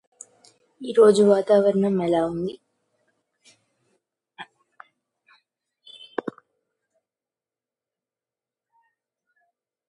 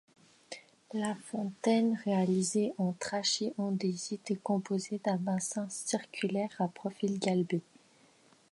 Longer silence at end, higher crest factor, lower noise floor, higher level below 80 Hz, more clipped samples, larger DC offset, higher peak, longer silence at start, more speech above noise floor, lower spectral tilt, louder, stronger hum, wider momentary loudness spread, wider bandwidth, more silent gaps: first, 5.45 s vs 0.95 s; about the same, 22 dB vs 18 dB; first, under -90 dBFS vs -64 dBFS; first, -66 dBFS vs -80 dBFS; neither; neither; first, -4 dBFS vs -16 dBFS; first, 0.8 s vs 0.5 s; first, over 71 dB vs 31 dB; first, -6.5 dB/octave vs -5 dB/octave; first, -20 LUFS vs -33 LUFS; neither; first, 28 LU vs 8 LU; about the same, 11.5 kHz vs 11.5 kHz; neither